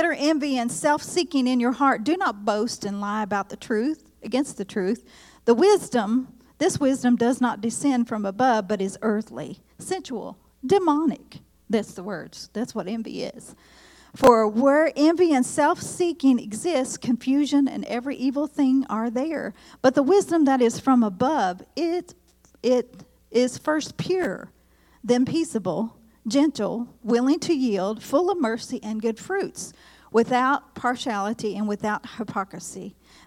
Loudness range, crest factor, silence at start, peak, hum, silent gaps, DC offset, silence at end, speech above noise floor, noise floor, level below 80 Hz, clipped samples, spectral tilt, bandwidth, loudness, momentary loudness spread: 5 LU; 22 dB; 0 s; -2 dBFS; none; none; under 0.1%; 0.35 s; 27 dB; -50 dBFS; -60 dBFS; under 0.1%; -4.5 dB/octave; 15.5 kHz; -23 LUFS; 13 LU